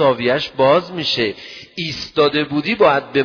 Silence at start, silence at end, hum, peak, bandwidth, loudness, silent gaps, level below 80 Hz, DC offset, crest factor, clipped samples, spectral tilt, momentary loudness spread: 0 s; 0 s; none; -2 dBFS; 5.4 kHz; -17 LUFS; none; -52 dBFS; under 0.1%; 16 dB; under 0.1%; -5.5 dB/octave; 10 LU